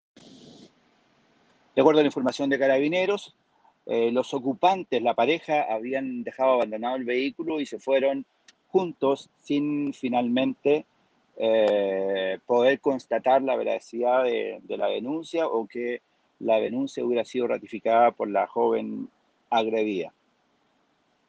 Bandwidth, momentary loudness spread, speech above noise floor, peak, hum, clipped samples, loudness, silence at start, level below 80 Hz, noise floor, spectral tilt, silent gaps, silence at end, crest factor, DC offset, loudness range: 9 kHz; 8 LU; 44 dB; -4 dBFS; none; under 0.1%; -25 LUFS; 1.75 s; -76 dBFS; -68 dBFS; -5.5 dB/octave; none; 1.2 s; 20 dB; under 0.1%; 3 LU